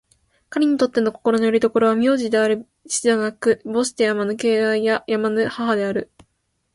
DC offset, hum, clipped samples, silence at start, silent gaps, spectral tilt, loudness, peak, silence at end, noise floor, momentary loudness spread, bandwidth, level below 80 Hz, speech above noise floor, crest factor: under 0.1%; none; under 0.1%; 0.5 s; none; -4 dB/octave; -20 LUFS; -6 dBFS; 0.7 s; -70 dBFS; 5 LU; 11.5 kHz; -62 dBFS; 51 dB; 14 dB